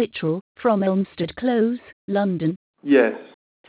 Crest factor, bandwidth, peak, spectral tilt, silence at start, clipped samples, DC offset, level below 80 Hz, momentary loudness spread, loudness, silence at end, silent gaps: 18 dB; 4 kHz; -4 dBFS; -11 dB/octave; 0 s; under 0.1%; under 0.1%; -60 dBFS; 9 LU; -22 LUFS; 0.4 s; 0.41-0.55 s, 1.93-2.08 s, 2.56-2.74 s